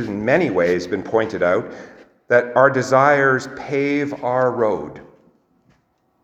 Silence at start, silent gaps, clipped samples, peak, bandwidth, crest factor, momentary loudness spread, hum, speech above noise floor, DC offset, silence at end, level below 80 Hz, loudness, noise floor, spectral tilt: 0 s; none; under 0.1%; 0 dBFS; 8.6 kHz; 20 dB; 9 LU; none; 46 dB; under 0.1%; 1.2 s; -58 dBFS; -18 LUFS; -64 dBFS; -6 dB/octave